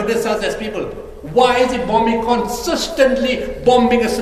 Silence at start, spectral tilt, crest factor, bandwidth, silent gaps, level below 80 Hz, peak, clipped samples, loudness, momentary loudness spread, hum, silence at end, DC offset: 0 s; -4 dB/octave; 16 dB; 15 kHz; none; -36 dBFS; 0 dBFS; under 0.1%; -16 LUFS; 10 LU; none; 0 s; under 0.1%